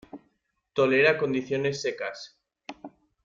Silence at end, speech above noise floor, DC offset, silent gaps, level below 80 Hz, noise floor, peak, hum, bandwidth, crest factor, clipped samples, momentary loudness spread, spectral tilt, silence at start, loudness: 0.35 s; 48 dB; under 0.1%; none; -68 dBFS; -73 dBFS; -8 dBFS; none; 7.6 kHz; 20 dB; under 0.1%; 25 LU; -5 dB/octave; 0.15 s; -25 LUFS